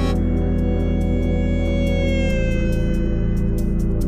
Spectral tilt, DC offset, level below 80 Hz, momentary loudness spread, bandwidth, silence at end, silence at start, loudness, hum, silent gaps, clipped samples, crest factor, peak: -8 dB/octave; under 0.1%; -22 dBFS; 2 LU; 15 kHz; 0 s; 0 s; -21 LUFS; none; none; under 0.1%; 10 dB; -8 dBFS